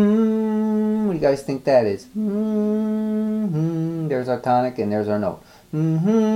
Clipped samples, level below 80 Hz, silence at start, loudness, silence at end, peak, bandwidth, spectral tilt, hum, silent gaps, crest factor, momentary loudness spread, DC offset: under 0.1%; -56 dBFS; 0 s; -21 LUFS; 0 s; -6 dBFS; 11.5 kHz; -8.5 dB/octave; none; none; 14 dB; 6 LU; under 0.1%